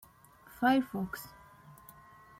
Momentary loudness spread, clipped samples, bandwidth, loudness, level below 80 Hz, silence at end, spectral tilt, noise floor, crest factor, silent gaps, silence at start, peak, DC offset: 26 LU; under 0.1%; 16.5 kHz; -32 LUFS; -66 dBFS; 1.1 s; -5.5 dB/octave; -59 dBFS; 22 dB; none; 0.6 s; -14 dBFS; under 0.1%